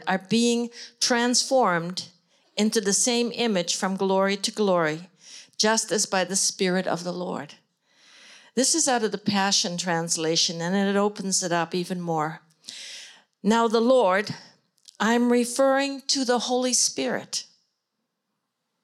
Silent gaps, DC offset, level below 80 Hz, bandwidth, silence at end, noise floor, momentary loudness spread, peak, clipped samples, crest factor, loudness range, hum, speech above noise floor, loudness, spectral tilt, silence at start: none; under 0.1%; -80 dBFS; 15 kHz; 1.4 s; -80 dBFS; 14 LU; -8 dBFS; under 0.1%; 16 dB; 3 LU; none; 56 dB; -23 LUFS; -3 dB/octave; 0 s